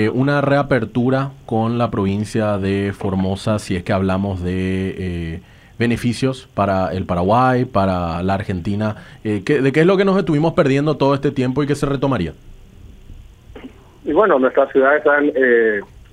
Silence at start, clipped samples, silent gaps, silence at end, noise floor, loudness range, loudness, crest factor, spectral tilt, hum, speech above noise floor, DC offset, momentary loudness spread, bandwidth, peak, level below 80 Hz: 0 s; under 0.1%; none; 0.15 s; -40 dBFS; 4 LU; -18 LUFS; 16 dB; -7.5 dB/octave; none; 23 dB; under 0.1%; 9 LU; 12.5 kHz; 0 dBFS; -42 dBFS